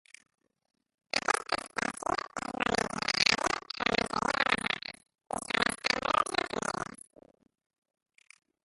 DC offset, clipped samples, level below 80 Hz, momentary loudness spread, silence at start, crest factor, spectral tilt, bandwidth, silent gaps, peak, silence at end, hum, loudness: under 0.1%; under 0.1%; -60 dBFS; 10 LU; 1.15 s; 28 dB; -2 dB/octave; 12 kHz; none; -6 dBFS; 1.8 s; none; -30 LUFS